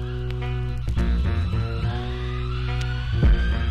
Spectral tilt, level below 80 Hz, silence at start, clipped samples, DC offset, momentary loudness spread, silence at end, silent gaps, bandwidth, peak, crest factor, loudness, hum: -7.5 dB/octave; -24 dBFS; 0 s; under 0.1%; under 0.1%; 7 LU; 0 s; none; 7.2 kHz; -10 dBFS; 12 dB; -25 LUFS; none